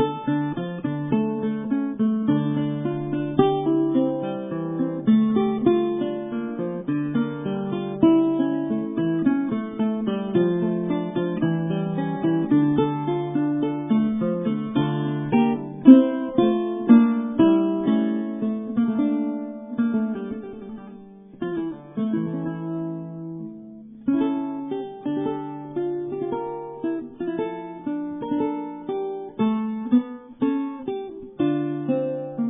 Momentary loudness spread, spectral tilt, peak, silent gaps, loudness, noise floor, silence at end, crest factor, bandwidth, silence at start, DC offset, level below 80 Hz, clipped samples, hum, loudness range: 12 LU; -12 dB/octave; 0 dBFS; none; -23 LUFS; -43 dBFS; 0 s; 22 dB; 3.8 kHz; 0 s; under 0.1%; -60 dBFS; under 0.1%; none; 10 LU